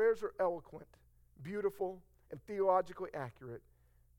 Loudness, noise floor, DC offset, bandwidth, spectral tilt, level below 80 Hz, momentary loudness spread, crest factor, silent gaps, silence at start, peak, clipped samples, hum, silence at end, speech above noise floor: -37 LUFS; -68 dBFS; under 0.1%; 17 kHz; -7 dB/octave; -68 dBFS; 21 LU; 20 dB; none; 0 s; -18 dBFS; under 0.1%; none; 0.6 s; 30 dB